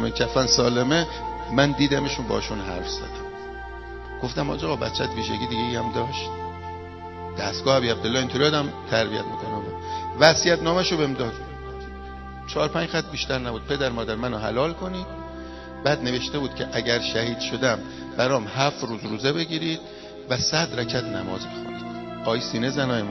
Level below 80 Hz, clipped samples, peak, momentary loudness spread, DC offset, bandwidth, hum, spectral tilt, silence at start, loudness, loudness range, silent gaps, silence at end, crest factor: -42 dBFS; under 0.1%; 0 dBFS; 16 LU; under 0.1%; 6.8 kHz; none; -4 dB/octave; 0 s; -24 LUFS; 6 LU; none; 0 s; 26 dB